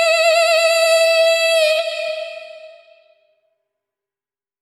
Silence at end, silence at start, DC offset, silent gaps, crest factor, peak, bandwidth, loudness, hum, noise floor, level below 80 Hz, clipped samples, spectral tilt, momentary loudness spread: 1.95 s; 0 s; under 0.1%; none; 14 dB; -4 dBFS; 16 kHz; -14 LUFS; none; under -90 dBFS; -88 dBFS; under 0.1%; 5 dB/octave; 14 LU